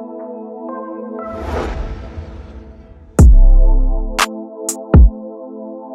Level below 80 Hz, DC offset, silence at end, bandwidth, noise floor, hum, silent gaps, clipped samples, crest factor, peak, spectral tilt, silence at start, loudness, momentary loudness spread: -14 dBFS; under 0.1%; 0 s; 14 kHz; -38 dBFS; none; none; under 0.1%; 12 dB; 0 dBFS; -6 dB/octave; 0 s; -16 LUFS; 20 LU